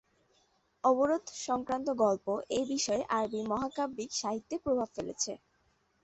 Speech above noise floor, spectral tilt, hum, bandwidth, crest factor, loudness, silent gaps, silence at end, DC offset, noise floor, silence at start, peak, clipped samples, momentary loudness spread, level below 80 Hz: 40 dB; -3.5 dB/octave; none; 8.4 kHz; 18 dB; -32 LUFS; none; 0.65 s; under 0.1%; -73 dBFS; 0.85 s; -14 dBFS; under 0.1%; 7 LU; -66 dBFS